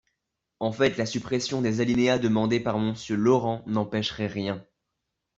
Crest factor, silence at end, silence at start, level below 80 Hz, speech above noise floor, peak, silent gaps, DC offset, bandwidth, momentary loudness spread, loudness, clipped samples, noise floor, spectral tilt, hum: 18 dB; 0.75 s; 0.6 s; -60 dBFS; 57 dB; -8 dBFS; none; under 0.1%; 7.8 kHz; 9 LU; -26 LUFS; under 0.1%; -82 dBFS; -5.5 dB/octave; none